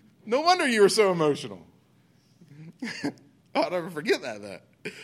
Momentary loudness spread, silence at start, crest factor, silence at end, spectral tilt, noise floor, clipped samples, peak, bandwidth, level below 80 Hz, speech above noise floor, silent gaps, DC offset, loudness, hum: 20 LU; 0.25 s; 18 dB; 0 s; -4 dB/octave; -62 dBFS; under 0.1%; -8 dBFS; 14.5 kHz; -78 dBFS; 37 dB; none; under 0.1%; -25 LUFS; none